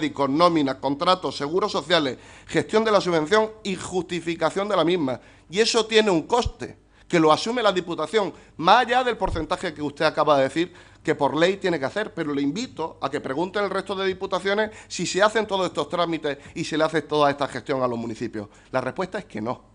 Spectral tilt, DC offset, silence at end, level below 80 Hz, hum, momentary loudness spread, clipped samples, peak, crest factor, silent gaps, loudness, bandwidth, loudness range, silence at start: -4.5 dB/octave; under 0.1%; 0.2 s; -48 dBFS; none; 11 LU; under 0.1%; -2 dBFS; 22 dB; none; -23 LUFS; 10.5 kHz; 4 LU; 0 s